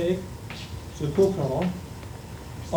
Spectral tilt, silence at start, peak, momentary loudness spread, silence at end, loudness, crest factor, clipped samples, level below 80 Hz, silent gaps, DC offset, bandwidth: -7 dB/octave; 0 s; -10 dBFS; 16 LU; 0 s; -28 LUFS; 18 dB; under 0.1%; -46 dBFS; none; under 0.1%; over 20 kHz